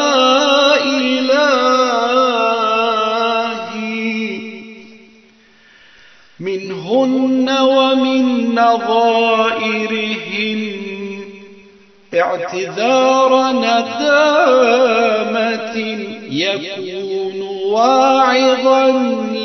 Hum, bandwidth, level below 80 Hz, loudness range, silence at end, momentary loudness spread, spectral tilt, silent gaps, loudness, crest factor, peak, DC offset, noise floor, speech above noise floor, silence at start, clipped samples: none; 6.6 kHz; -68 dBFS; 8 LU; 0 s; 12 LU; -1.5 dB/octave; none; -14 LUFS; 14 dB; 0 dBFS; under 0.1%; -48 dBFS; 35 dB; 0 s; under 0.1%